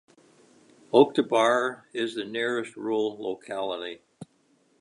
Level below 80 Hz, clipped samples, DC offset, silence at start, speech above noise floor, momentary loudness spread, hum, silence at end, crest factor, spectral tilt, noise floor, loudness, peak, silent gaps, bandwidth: -78 dBFS; under 0.1%; under 0.1%; 0.95 s; 40 dB; 14 LU; none; 0.55 s; 22 dB; -4.5 dB/octave; -66 dBFS; -26 LUFS; -6 dBFS; none; 11 kHz